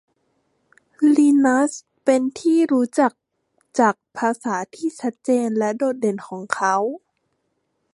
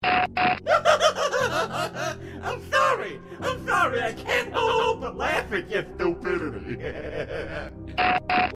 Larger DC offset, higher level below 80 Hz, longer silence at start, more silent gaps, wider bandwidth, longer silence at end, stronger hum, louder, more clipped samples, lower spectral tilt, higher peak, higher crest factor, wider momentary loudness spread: neither; second, -74 dBFS vs -48 dBFS; first, 1 s vs 0 s; neither; second, 11.5 kHz vs 15.5 kHz; first, 0.95 s vs 0 s; neither; first, -20 LUFS vs -25 LUFS; neither; about the same, -5 dB/octave vs -4 dB/octave; first, -2 dBFS vs -6 dBFS; about the same, 18 dB vs 20 dB; about the same, 11 LU vs 11 LU